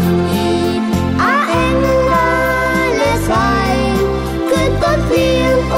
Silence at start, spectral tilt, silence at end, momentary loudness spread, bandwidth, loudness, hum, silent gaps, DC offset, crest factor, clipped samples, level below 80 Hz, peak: 0 s; -6 dB/octave; 0 s; 3 LU; 16 kHz; -14 LUFS; none; none; under 0.1%; 12 dB; under 0.1%; -26 dBFS; -2 dBFS